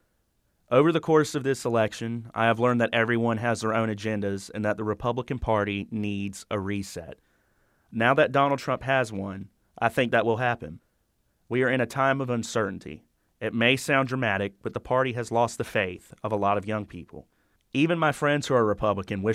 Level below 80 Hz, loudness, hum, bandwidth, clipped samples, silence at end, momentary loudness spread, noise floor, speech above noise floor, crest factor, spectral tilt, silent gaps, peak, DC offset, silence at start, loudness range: -54 dBFS; -26 LUFS; none; 15.5 kHz; under 0.1%; 0 s; 11 LU; -71 dBFS; 45 dB; 20 dB; -5.5 dB/octave; none; -6 dBFS; under 0.1%; 0.7 s; 4 LU